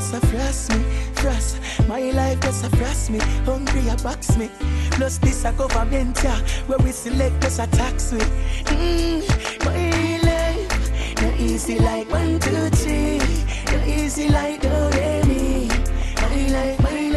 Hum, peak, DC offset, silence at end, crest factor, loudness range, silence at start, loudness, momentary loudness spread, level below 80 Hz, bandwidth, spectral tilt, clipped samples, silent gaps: none; -6 dBFS; under 0.1%; 0 s; 14 dB; 1 LU; 0 s; -21 LUFS; 4 LU; -22 dBFS; 13 kHz; -5.5 dB/octave; under 0.1%; none